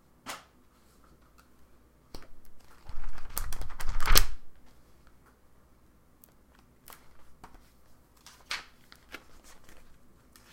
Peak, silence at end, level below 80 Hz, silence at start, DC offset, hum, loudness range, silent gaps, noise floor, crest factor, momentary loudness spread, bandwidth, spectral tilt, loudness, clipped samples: 0 dBFS; 0.75 s; -36 dBFS; 0.25 s; under 0.1%; none; 16 LU; none; -61 dBFS; 30 dB; 31 LU; 16.5 kHz; -1.5 dB/octave; -33 LUFS; under 0.1%